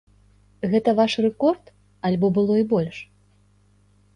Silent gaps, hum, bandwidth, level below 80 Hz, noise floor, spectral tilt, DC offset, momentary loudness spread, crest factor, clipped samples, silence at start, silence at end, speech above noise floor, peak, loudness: none; 50 Hz at -45 dBFS; 10 kHz; -58 dBFS; -58 dBFS; -7.5 dB/octave; under 0.1%; 12 LU; 16 dB; under 0.1%; 0.65 s; 1.1 s; 38 dB; -6 dBFS; -22 LUFS